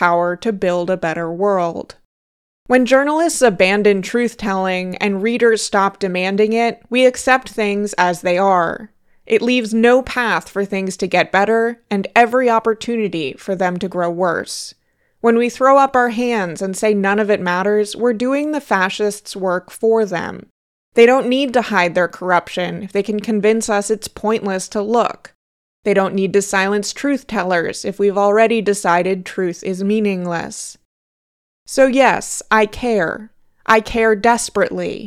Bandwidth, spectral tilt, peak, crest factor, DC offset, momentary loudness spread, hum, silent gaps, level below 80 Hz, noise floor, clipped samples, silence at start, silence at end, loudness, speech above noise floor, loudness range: 14.5 kHz; -4.5 dB/octave; 0 dBFS; 16 dB; under 0.1%; 9 LU; none; 2.05-2.66 s, 20.50-20.92 s, 25.35-25.83 s, 30.85-31.66 s; -50 dBFS; under -90 dBFS; under 0.1%; 0 s; 0 s; -16 LUFS; over 74 dB; 3 LU